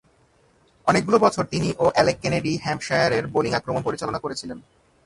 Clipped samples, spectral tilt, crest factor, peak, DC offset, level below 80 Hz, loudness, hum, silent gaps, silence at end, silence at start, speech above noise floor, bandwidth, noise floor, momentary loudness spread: under 0.1%; -5 dB/octave; 22 dB; -2 dBFS; under 0.1%; -52 dBFS; -22 LUFS; none; none; 0.45 s; 0.85 s; 38 dB; 11.5 kHz; -60 dBFS; 10 LU